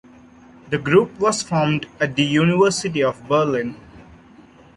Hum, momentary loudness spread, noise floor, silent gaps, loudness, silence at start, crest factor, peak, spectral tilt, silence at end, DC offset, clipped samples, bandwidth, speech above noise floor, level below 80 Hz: none; 8 LU; -47 dBFS; none; -19 LUFS; 0.65 s; 18 dB; -2 dBFS; -5 dB/octave; 0.75 s; under 0.1%; under 0.1%; 11.5 kHz; 28 dB; -54 dBFS